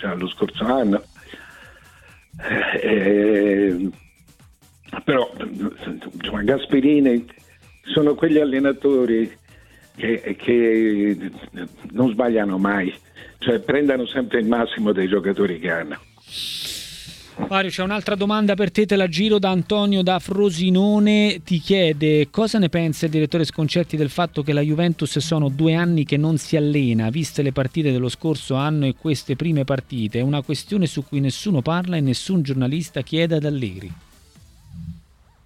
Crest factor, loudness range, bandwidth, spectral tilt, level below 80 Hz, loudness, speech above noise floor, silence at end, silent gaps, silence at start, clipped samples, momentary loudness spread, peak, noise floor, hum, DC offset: 16 dB; 5 LU; 15 kHz; -6.5 dB/octave; -50 dBFS; -20 LUFS; 32 dB; 0.45 s; none; 0 s; under 0.1%; 11 LU; -4 dBFS; -52 dBFS; none; under 0.1%